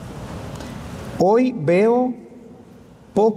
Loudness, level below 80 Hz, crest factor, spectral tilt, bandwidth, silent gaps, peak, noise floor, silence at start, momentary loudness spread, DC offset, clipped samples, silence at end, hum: -18 LUFS; -48 dBFS; 14 dB; -7.5 dB/octave; 14 kHz; none; -6 dBFS; -45 dBFS; 0 s; 17 LU; under 0.1%; under 0.1%; 0 s; none